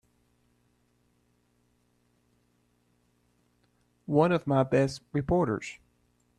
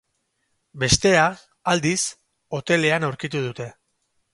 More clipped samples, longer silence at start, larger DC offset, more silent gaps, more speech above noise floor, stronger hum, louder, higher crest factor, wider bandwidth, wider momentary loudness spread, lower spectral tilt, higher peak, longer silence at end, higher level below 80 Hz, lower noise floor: neither; first, 4.1 s vs 0.75 s; neither; neither; second, 44 dB vs 51 dB; first, 60 Hz at -60 dBFS vs none; second, -27 LUFS vs -21 LUFS; about the same, 22 dB vs 22 dB; about the same, 11 kHz vs 11.5 kHz; second, 9 LU vs 14 LU; first, -7.5 dB/octave vs -3.5 dB/octave; second, -10 dBFS vs -2 dBFS; about the same, 0.65 s vs 0.65 s; second, -56 dBFS vs -48 dBFS; about the same, -70 dBFS vs -72 dBFS